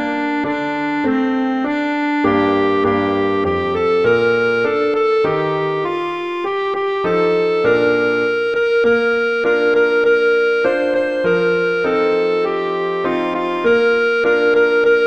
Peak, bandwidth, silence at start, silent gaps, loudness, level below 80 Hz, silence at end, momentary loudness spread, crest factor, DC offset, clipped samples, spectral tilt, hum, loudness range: -4 dBFS; 7.2 kHz; 0 s; none; -16 LUFS; -52 dBFS; 0 s; 6 LU; 12 dB; 0.2%; under 0.1%; -6.5 dB/octave; none; 2 LU